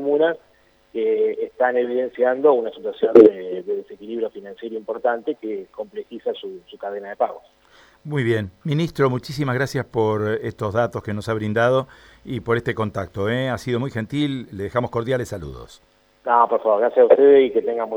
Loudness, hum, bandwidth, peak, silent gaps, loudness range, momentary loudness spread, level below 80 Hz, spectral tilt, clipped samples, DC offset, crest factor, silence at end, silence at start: -20 LUFS; none; 12.5 kHz; 0 dBFS; none; 9 LU; 17 LU; -54 dBFS; -7 dB/octave; under 0.1%; under 0.1%; 20 dB; 0 s; 0 s